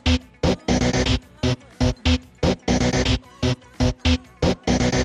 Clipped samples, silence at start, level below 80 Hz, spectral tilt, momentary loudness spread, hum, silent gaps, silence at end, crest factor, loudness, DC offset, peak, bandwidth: under 0.1%; 0.05 s; -28 dBFS; -5 dB/octave; 5 LU; none; none; 0 s; 16 dB; -22 LUFS; under 0.1%; -6 dBFS; 10 kHz